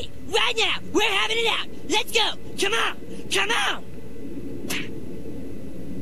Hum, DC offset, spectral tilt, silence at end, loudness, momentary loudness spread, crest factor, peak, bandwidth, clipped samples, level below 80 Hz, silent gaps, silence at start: none; 4%; -2 dB/octave; 0 s; -23 LUFS; 17 LU; 20 dB; -8 dBFS; 14 kHz; under 0.1%; -48 dBFS; none; 0 s